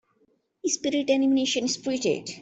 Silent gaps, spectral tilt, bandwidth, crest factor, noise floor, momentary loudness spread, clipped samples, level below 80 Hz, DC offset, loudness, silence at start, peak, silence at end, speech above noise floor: none; -3 dB/octave; 8.4 kHz; 16 dB; -68 dBFS; 6 LU; under 0.1%; -68 dBFS; under 0.1%; -25 LUFS; 0.65 s; -12 dBFS; 0 s; 43 dB